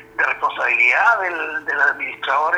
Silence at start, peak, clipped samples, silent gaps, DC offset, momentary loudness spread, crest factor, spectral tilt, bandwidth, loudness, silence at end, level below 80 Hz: 0 s; -2 dBFS; under 0.1%; none; under 0.1%; 9 LU; 16 dB; -2 dB/octave; 14.5 kHz; -17 LUFS; 0 s; -64 dBFS